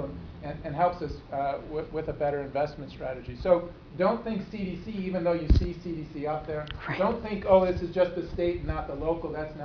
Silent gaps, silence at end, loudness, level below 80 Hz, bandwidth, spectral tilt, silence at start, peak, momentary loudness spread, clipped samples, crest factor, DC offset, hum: none; 0 s; -29 LUFS; -38 dBFS; 5.4 kHz; -8.5 dB/octave; 0 s; -8 dBFS; 11 LU; under 0.1%; 20 dB; under 0.1%; none